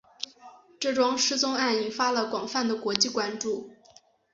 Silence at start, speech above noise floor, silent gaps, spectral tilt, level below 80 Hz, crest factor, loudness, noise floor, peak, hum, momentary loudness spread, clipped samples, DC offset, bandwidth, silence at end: 0.2 s; 31 dB; none; -1.5 dB/octave; -72 dBFS; 26 dB; -26 LUFS; -58 dBFS; -2 dBFS; none; 11 LU; under 0.1%; under 0.1%; 8 kHz; 0.6 s